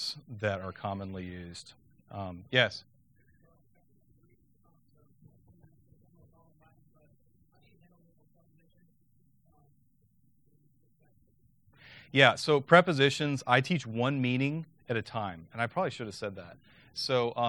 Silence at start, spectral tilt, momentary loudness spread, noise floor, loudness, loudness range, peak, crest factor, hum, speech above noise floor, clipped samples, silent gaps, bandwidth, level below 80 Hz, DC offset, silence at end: 0 s; -5 dB/octave; 20 LU; -69 dBFS; -29 LUFS; 9 LU; -4 dBFS; 28 dB; none; 40 dB; under 0.1%; none; 18.5 kHz; -70 dBFS; under 0.1%; 0 s